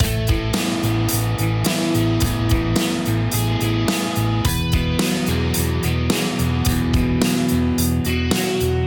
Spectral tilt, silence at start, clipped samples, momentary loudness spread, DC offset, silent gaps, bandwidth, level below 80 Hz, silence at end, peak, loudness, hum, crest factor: -5 dB/octave; 0 s; under 0.1%; 2 LU; under 0.1%; none; 19 kHz; -28 dBFS; 0 s; -4 dBFS; -20 LUFS; none; 14 dB